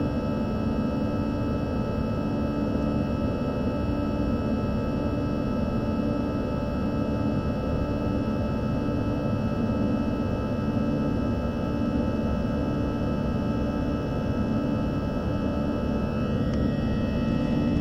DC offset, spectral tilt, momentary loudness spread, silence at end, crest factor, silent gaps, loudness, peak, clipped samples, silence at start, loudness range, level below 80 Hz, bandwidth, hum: under 0.1%; -9 dB/octave; 2 LU; 0 s; 14 dB; none; -27 LUFS; -12 dBFS; under 0.1%; 0 s; 1 LU; -36 dBFS; 8.2 kHz; none